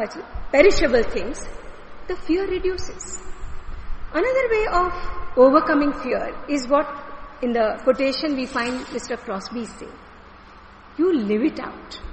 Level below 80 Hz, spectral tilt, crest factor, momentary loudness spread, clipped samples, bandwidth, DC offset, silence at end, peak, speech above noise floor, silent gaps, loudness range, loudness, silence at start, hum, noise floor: -36 dBFS; -4.5 dB/octave; 20 dB; 23 LU; under 0.1%; 8.8 kHz; under 0.1%; 0 s; -2 dBFS; 24 dB; none; 6 LU; -21 LUFS; 0 s; none; -44 dBFS